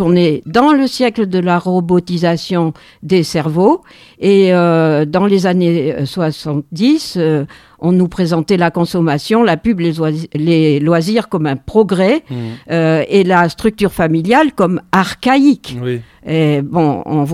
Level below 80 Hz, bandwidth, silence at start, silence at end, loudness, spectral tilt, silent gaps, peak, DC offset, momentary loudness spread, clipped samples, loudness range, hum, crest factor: -44 dBFS; 15 kHz; 0 s; 0 s; -13 LUFS; -7 dB/octave; none; 0 dBFS; under 0.1%; 7 LU; under 0.1%; 2 LU; none; 12 dB